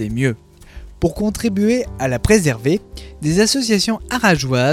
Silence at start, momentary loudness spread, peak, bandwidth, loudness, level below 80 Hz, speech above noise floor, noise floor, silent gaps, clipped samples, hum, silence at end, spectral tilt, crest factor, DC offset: 0 s; 8 LU; 0 dBFS; 16 kHz; -17 LUFS; -36 dBFS; 21 dB; -37 dBFS; none; under 0.1%; none; 0 s; -5 dB/octave; 18 dB; under 0.1%